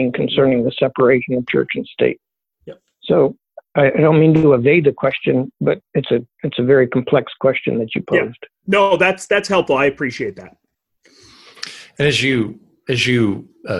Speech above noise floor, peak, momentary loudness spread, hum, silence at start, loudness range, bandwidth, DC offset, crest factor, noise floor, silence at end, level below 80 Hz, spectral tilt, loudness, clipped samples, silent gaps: 43 dB; -2 dBFS; 14 LU; none; 0 s; 5 LU; 12 kHz; under 0.1%; 16 dB; -59 dBFS; 0 s; -52 dBFS; -6 dB/octave; -16 LUFS; under 0.1%; none